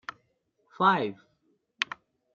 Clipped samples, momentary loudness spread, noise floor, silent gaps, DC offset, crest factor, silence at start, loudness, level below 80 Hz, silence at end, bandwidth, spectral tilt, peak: under 0.1%; 19 LU; -73 dBFS; none; under 0.1%; 26 dB; 0.8 s; -28 LUFS; -78 dBFS; 0.5 s; 7.4 kHz; -2.5 dB/octave; -6 dBFS